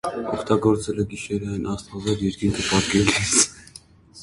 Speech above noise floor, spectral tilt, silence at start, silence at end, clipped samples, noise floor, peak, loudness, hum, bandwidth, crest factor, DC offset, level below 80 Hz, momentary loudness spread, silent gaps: 25 dB; -3.5 dB/octave; 0.05 s; 0 s; under 0.1%; -47 dBFS; 0 dBFS; -22 LUFS; none; 11.5 kHz; 22 dB; under 0.1%; -44 dBFS; 10 LU; none